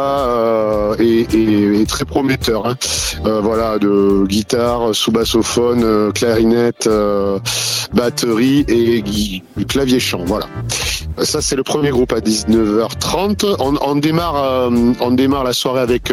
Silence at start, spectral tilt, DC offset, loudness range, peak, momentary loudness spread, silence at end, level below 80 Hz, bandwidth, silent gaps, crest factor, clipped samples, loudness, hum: 0 s; -4.5 dB/octave; under 0.1%; 2 LU; -2 dBFS; 4 LU; 0 s; -34 dBFS; 16.5 kHz; none; 14 dB; under 0.1%; -15 LUFS; none